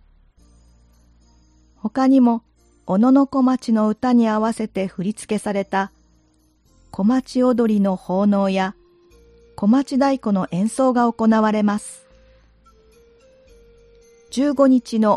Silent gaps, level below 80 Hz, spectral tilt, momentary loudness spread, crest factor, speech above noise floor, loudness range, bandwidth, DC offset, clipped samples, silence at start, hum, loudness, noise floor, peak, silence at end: none; -56 dBFS; -6.5 dB/octave; 11 LU; 16 dB; 41 dB; 5 LU; 11.5 kHz; under 0.1%; under 0.1%; 1.85 s; none; -19 LUFS; -59 dBFS; -4 dBFS; 0 s